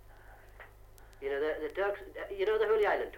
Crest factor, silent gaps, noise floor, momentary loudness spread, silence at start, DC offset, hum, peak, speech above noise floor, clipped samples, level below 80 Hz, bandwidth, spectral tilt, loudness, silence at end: 16 dB; none; -54 dBFS; 24 LU; 0.1 s; under 0.1%; none; -18 dBFS; 23 dB; under 0.1%; -56 dBFS; 16.5 kHz; -5 dB/octave; -33 LUFS; 0 s